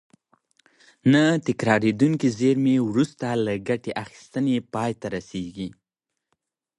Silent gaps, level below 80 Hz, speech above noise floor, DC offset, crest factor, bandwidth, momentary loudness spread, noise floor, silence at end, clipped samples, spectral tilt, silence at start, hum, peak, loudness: none; -60 dBFS; 62 dB; under 0.1%; 18 dB; 11.5 kHz; 14 LU; -84 dBFS; 1.1 s; under 0.1%; -6.5 dB/octave; 1.05 s; none; -6 dBFS; -23 LUFS